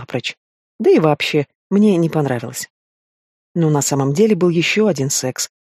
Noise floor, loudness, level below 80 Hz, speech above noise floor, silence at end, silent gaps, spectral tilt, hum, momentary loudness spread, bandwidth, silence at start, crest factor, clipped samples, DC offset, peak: under -90 dBFS; -16 LUFS; -62 dBFS; over 74 dB; 0.15 s; 0.37-0.79 s, 1.55-1.70 s, 2.70-3.55 s; -5 dB/octave; none; 12 LU; 15.5 kHz; 0 s; 16 dB; under 0.1%; under 0.1%; 0 dBFS